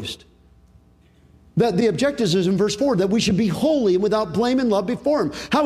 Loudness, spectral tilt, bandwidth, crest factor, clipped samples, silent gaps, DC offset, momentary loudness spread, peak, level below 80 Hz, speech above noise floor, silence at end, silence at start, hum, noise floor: -20 LUFS; -5.5 dB/octave; 14.5 kHz; 14 dB; under 0.1%; none; under 0.1%; 3 LU; -6 dBFS; -50 dBFS; 35 dB; 0 s; 0 s; none; -54 dBFS